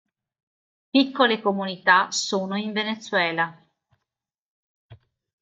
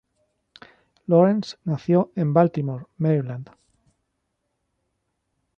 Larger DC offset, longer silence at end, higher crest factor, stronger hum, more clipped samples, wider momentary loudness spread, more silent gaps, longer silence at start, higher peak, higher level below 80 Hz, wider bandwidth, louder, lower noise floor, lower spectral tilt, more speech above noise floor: neither; second, 0.5 s vs 2.15 s; about the same, 22 dB vs 20 dB; neither; neither; second, 8 LU vs 14 LU; first, 4.40-4.89 s vs none; second, 0.95 s vs 1.1 s; about the same, -4 dBFS vs -4 dBFS; second, -74 dBFS vs -66 dBFS; first, 9.2 kHz vs 7.4 kHz; about the same, -22 LUFS vs -22 LUFS; first, -85 dBFS vs -76 dBFS; second, -3.5 dB/octave vs -9 dB/octave; first, 63 dB vs 55 dB